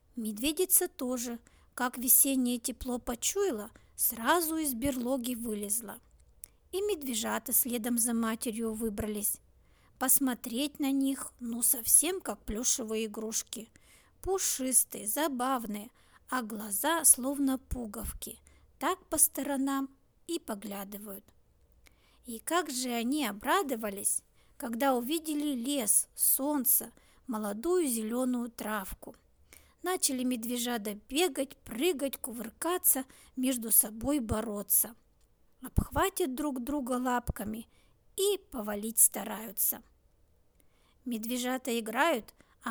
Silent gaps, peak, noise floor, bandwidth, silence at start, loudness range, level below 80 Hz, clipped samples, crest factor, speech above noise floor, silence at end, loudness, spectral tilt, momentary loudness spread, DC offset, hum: none; -6 dBFS; -66 dBFS; over 20 kHz; 0.15 s; 5 LU; -54 dBFS; under 0.1%; 26 dB; 35 dB; 0 s; -30 LUFS; -2.5 dB/octave; 15 LU; under 0.1%; none